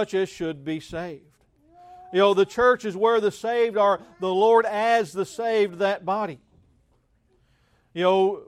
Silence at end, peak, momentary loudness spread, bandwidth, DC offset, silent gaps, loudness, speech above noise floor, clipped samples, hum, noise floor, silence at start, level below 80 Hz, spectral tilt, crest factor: 0.05 s; -6 dBFS; 12 LU; 13 kHz; under 0.1%; none; -23 LUFS; 43 dB; under 0.1%; none; -65 dBFS; 0 s; -62 dBFS; -5 dB/octave; 18 dB